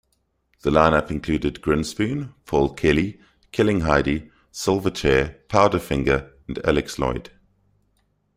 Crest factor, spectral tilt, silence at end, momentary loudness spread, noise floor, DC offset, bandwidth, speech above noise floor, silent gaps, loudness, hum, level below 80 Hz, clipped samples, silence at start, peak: 20 dB; -6 dB/octave; 1.15 s; 10 LU; -69 dBFS; under 0.1%; 16 kHz; 49 dB; none; -22 LUFS; none; -38 dBFS; under 0.1%; 0.65 s; -2 dBFS